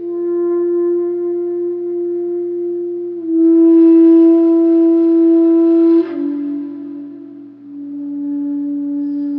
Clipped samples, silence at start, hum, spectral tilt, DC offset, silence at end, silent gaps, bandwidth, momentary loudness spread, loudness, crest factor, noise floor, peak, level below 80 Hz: under 0.1%; 0 s; none; -10 dB/octave; under 0.1%; 0 s; none; 2.8 kHz; 18 LU; -13 LUFS; 10 dB; -34 dBFS; -2 dBFS; -84 dBFS